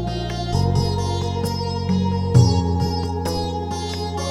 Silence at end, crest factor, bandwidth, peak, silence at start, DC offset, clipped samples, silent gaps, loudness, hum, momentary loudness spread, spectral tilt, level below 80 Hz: 0 s; 18 dB; 13.5 kHz; -2 dBFS; 0 s; under 0.1%; under 0.1%; none; -21 LUFS; none; 9 LU; -6.5 dB/octave; -36 dBFS